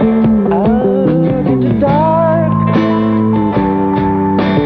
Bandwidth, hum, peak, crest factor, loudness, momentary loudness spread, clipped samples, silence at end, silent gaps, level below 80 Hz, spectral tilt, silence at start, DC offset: 5.2 kHz; none; -2 dBFS; 10 dB; -12 LUFS; 2 LU; under 0.1%; 0 s; none; -34 dBFS; -10.5 dB/octave; 0 s; under 0.1%